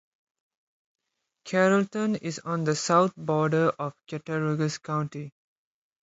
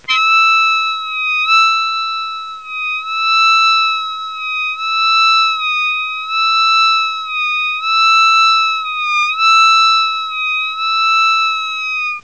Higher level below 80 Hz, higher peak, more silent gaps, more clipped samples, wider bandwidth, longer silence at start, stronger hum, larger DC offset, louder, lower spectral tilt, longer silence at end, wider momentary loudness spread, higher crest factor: about the same, -70 dBFS vs -66 dBFS; second, -8 dBFS vs -2 dBFS; neither; neither; about the same, 8 kHz vs 8 kHz; first, 1.45 s vs 0.1 s; neither; second, under 0.1% vs 0.4%; second, -26 LUFS vs -12 LUFS; first, -5.5 dB/octave vs 4.5 dB/octave; first, 0.75 s vs 0.05 s; first, 13 LU vs 9 LU; first, 20 dB vs 12 dB